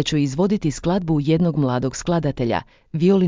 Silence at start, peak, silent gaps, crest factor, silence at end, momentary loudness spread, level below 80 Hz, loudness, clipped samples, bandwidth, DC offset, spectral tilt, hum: 0 s; -6 dBFS; none; 14 dB; 0 s; 5 LU; -44 dBFS; -21 LUFS; under 0.1%; 7.6 kHz; under 0.1%; -6.5 dB/octave; none